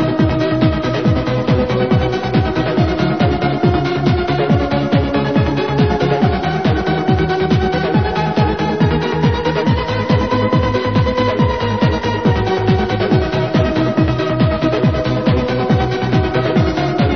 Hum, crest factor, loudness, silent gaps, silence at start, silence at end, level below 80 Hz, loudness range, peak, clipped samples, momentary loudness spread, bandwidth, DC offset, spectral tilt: none; 14 dB; -15 LUFS; none; 0 s; 0 s; -28 dBFS; 0 LU; 0 dBFS; under 0.1%; 1 LU; 6.6 kHz; 0.7%; -8 dB/octave